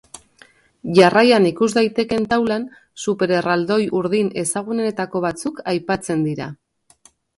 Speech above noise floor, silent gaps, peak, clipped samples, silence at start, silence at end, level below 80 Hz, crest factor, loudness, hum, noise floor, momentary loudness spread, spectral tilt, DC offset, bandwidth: 36 dB; none; 0 dBFS; under 0.1%; 0.85 s; 0.85 s; -56 dBFS; 20 dB; -19 LUFS; none; -54 dBFS; 12 LU; -5 dB/octave; under 0.1%; 11.5 kHz